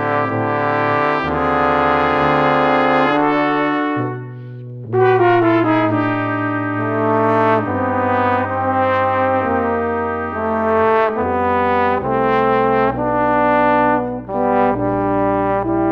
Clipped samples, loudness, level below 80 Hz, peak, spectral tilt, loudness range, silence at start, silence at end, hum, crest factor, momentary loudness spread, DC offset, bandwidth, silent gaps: under 0.1%; -16 LUFS; -44 dBFS; -2 dBFS; -8.5 dB/octave; 2 LU; 0 s; 0 s; none; 14 dB; 6 LU; under 0.1%; 6.6 kHz; none